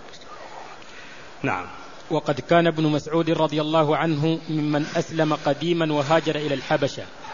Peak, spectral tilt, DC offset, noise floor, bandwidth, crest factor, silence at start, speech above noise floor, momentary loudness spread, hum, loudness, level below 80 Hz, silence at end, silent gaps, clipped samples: -4 dBFS; -6 dB/octave; 0.7%; -42 dBFS; 7.4 kHz; 20 dB; 0 s; 20 dB; 20 LU; none; -23 LUFS; -58 dBFS; 0 s; none; under 0.1%